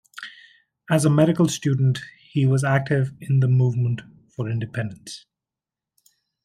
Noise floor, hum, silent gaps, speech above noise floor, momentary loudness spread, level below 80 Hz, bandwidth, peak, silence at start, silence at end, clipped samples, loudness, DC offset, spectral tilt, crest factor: -88 dBFS; none; none; 68 dB; 20 LU; -62 dBFS; 13 kHz; -6 dBFS; 0.15 s; 1.25 s; under 0.1%; -22 LUFS; under 0.1%; -6.5 dB/octave; 18 dB